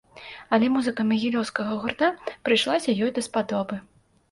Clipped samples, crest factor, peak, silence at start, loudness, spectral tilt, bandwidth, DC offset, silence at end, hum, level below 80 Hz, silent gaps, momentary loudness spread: under 0.1%; 18 dB; -8 dBFS; 0.15 s; -24 LUFS; -4.5 dB/octave; 11.5 kHz; under 0.1%; 0.5 s; none; -64 dBFS; none; 10 LU